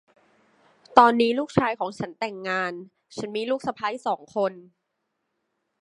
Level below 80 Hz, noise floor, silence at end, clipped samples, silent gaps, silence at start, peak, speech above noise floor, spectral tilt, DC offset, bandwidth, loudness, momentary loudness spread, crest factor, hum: -64 dBFS; -78 dBFS; 1.2 s; under 0.1%; none; 0.9 s; 0 dBFS; 54 dB; -5.5 dB/octave; under 0.1%; 11 kHz; -24 LUFS; 14 LU; 26 dB; none